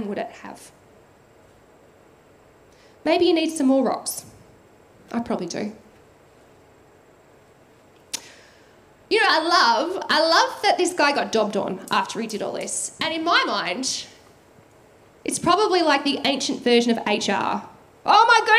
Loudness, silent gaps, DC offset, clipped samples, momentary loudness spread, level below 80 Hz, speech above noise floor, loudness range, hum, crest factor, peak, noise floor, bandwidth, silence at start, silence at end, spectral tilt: -21 LUFS; none; under 0.1%; under 0.1%; 14 LU; -66 dBFS; 32 dB; 15 LU; none; 20 dB; -4 dBFS; -53 dBFS; 15.5 kHz; 0 s; 0 s; -2.5 dB/octave